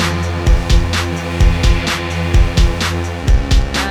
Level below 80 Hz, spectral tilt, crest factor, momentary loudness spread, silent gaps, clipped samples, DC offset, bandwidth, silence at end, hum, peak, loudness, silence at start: -14 dBFS; -5 dB/octave; 12 dB; 4 LU; none; under 0.1%; under 0.1%; 14.5 kHz; 0 s; none; 0 dBFS; -16 LUFS; 0 s